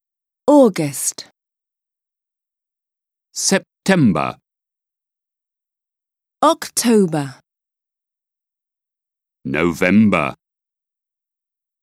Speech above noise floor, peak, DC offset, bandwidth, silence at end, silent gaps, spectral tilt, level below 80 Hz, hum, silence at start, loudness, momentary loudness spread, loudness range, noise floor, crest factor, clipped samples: 72 dB; 0 dBFS; under 0.1%; 16 kHz; 1.5 s; none; -4.5 dB/octave; -56 dBFS; none; 0.45 s; -16 LUFS; 13 LU; 2 LU; -87 dBFS; 20 dB; under 0.1%